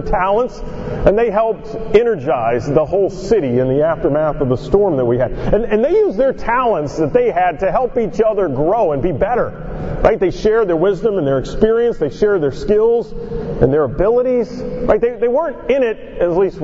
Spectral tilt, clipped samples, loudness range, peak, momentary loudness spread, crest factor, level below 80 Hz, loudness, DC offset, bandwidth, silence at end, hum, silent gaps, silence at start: -8 dB/octave; under 0.1%; 1 LU; 0 dBFS; 5 LU; 14 dB; -30 dBFS; -16 LUFS; under 0.1%; 7.8 kHz; 0 s; none; none; 0 s